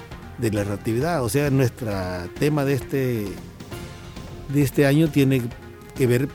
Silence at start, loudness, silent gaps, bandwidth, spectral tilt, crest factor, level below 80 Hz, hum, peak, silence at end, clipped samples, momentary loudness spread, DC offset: 0 s; -22 LUFS; none; 17.5 kHz; -6.5 dB/octave; 16 dB; -44 dBFS; none; -6 dBFS; 0 s; under 0.1%; 19 LU; under 0.1%